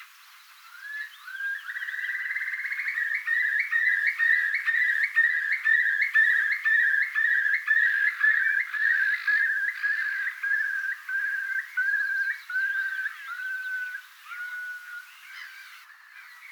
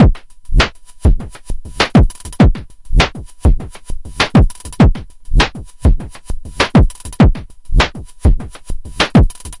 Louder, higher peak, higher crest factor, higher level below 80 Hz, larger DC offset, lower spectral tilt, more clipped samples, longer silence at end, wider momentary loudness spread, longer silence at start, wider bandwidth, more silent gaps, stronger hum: second, -24 LUFS vs -15 LUFS; second, -12 dBFS vs 0 dBFS; about the same, 16 dB vs 14 dB; second, under -90 dBFS vs -16 dBFS; neither; second, 9.5 dB/octave vs -6 dB/octave; neither; about the same, 0 s vs 0 s; about the same, 16 LU vs 18 LU; about the same, 0 s vs 0 s; first, over 20 kHz vs 11.5 kHz; neither; neither